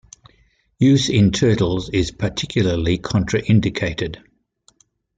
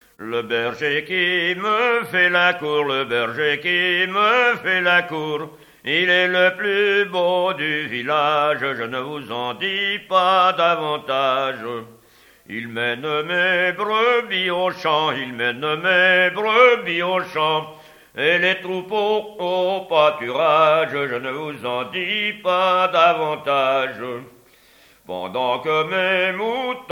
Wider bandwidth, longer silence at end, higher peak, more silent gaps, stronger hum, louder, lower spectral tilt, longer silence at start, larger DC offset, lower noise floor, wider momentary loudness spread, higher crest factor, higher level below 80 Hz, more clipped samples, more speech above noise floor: second, 9.2 kHz vs 16.5 kHz; first, 1 s vs 0 s; about the same, -4 dBFS vs -2 dBFS; neither; neither; about the same, -19 LUFS vs -19 LUFS; first, -6 dB/octave vs -4.5 dB/octave; first, 0.8 s vs 0.2 s; neither; first, -59 dBFS vs -52 dBFS; about the same, 9 LU vs 11 LU; about the same, 16 dB vs 18 dB; first, -40 dBFS vs -66 dBFS; neither; first, 42 dB vs 33 dB